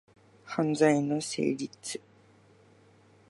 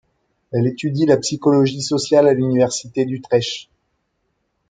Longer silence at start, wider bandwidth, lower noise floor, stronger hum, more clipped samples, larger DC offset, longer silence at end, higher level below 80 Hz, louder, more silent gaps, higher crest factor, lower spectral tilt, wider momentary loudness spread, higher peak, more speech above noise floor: about the same, 0.45 s vs 0.5 s; first, 11.5 kHz vs 9.6 kHz; second, -60 dBFS vs -70 dBFS; neither; neither; neither; first, 1.35 s vs 1.05 s; second, -76 dBFS vs -60 dBFS; second, -29 LUFS vs -18 LUFS; neither; about the same, 20 dB vs 16 dB; about the same, -5 dB/octave vs -5.5 dB/octave; first, 14 LU vs 8 LU; second, -12 dBFS vs -2 dBFS; second, 32 dB vs 53 dB